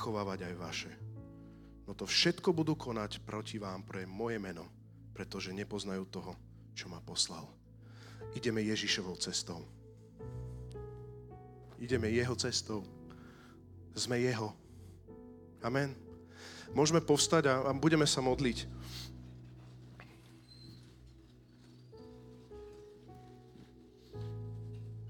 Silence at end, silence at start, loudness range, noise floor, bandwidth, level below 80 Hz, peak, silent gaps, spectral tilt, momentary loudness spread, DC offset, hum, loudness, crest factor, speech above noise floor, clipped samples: 0 s; 0 s; 22 LU; -59 dBFS; 17.5 kHz; -60 dBFS; -14 dBFS; none; -4 dB/octave; 25 LU; under 0.1%; none; -35 LUFS; 22 dB; 24 dB; under 0.1%